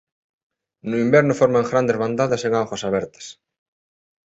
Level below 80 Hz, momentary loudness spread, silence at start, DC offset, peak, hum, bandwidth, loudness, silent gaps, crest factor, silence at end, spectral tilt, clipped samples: -58 dBFS; 18 LU; 0.85 s; under 0.1%; -2 dBFS; none; 8.2 kHz; -19 LUFS; none; 18 dB; 1 s; -6 dB/octave; under 0.1%